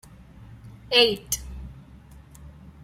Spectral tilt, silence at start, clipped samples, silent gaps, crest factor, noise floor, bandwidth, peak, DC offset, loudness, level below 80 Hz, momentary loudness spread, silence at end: -2 dB/octave; 0.5 s; under 0.1%; none; 24 dB; -48 dBFS; 16 kHz; -4 dBFS; under 0.1%; -21 LUFS; -46 dBFS; 25 LU; 0.15 s